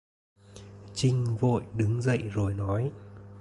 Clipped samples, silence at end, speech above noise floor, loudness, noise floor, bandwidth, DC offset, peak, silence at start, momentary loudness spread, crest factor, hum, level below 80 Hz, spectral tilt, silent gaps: under 0.1%; 0 s; 21 dB; -29 LUFS; -48 dBFS; 11.5 kHz; under 0.1%; -14 dBFS; 0.5 s; 21 LU; 16 dB; none; -50 dBFS; -7 dB/octave; none